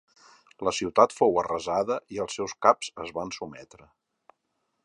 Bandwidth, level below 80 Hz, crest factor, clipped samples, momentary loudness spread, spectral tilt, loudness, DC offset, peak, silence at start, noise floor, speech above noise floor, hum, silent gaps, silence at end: 11 kHz; -62 dBFS; 24 dB; under 0.1%; 14 LU; -4 dB/octave; -26 LUFS; under 0.1%; -4 dBFS; 0.6 s; -78 dBFS; 51 dB; none; none; 1.2 s